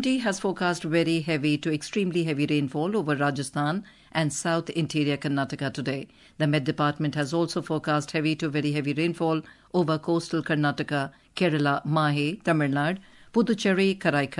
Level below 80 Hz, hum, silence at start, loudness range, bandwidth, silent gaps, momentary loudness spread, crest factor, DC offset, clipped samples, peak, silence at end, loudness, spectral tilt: -64 dBFS; none; 0 s; 2 LU; 11.5 kHz; none; 6 LU; 16 dB; under 0.1%; under 0.1%; -10 dBFS; 0 s; -26 LUFS; -5.5 dB/octave